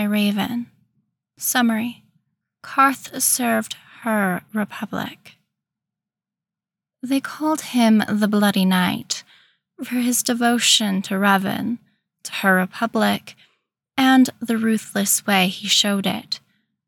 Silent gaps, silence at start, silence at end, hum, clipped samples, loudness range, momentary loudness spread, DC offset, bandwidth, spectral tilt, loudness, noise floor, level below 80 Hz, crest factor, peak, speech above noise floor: none; 0 s; 0.5 s; none; under 0.1%; 7 LU; 13 LU; under 0.1%; 19 kHz; -3.5 dB/octave; -20 LUFS; -89 dBFS; -70 dBFS; 18 dB; -4 dBFS; 69 dB